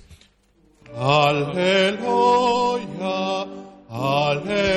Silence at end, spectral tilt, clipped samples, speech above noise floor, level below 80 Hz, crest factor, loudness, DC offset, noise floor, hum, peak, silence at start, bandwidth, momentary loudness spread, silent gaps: 0 s; -5 dB/octave; under 0.1%; 40 dB; -52 dBFS; 16 dB; -20 LUFS; under 0.1%; -59 dBFS; none; -6 dBFS; 0.1 s; 12.5 kHz; 13 LU; none